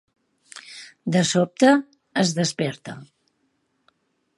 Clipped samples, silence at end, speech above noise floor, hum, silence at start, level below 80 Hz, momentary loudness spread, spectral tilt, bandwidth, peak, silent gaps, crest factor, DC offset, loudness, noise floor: under 0.1%; 1.35 s; 50 dB; none; 0.55 s; -70 dBFS; 23 LU; -4.5 dB/octave; 11.5 kHz; -4 dBFS; none; 20 dB; under 0.1%; -21 LUFS; -70 dBFS